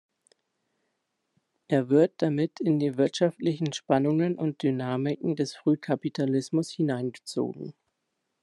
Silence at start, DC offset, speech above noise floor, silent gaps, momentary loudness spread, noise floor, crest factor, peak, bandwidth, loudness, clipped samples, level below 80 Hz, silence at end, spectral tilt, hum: 1.7 s; under 0.1%; 54 dB; none; 8 LU; -80 dBFS; 18 dB; -8 dBFS; 11.5 kHz; -27 LUFS; under 0.1%; -74 dBFS; 0.7 s; -7 dB/octave; none